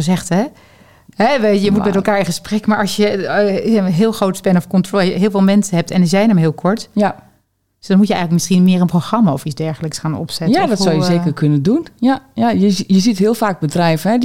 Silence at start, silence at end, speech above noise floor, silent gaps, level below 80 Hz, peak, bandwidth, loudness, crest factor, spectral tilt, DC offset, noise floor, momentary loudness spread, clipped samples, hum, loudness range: 0 s; 0 s; 47 dB; none; -50 dBFS; -2 dBFS; 15.5 kHz; -15 LUFS; 12 dB; -6 dB/octave; 1%; -60 dBFS; 6 LU; under 0.1%; none; 2 LU